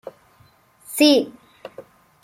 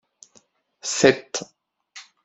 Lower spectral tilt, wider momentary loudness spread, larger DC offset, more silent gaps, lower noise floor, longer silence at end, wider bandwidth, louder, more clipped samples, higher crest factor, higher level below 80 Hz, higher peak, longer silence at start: about the same, -2.5 dB/octave vs -3 dB/octave; about the same, 26 LU vs 25 LU; neither; neither; second, -56 dBFS vs -60 dBFS; first, 0.45 s vs 0.25 s; first, 16 kHz vs 8.2 kHz; first, -17 LUFS vs -21 LUFS; neither; about the same, 20 dB vs 24 dB; second, -70 dBFS vs -62 dBFS; about the same, -2 dBFS vs 0 dBFS; about the same, 0.9 s vs 0.85 s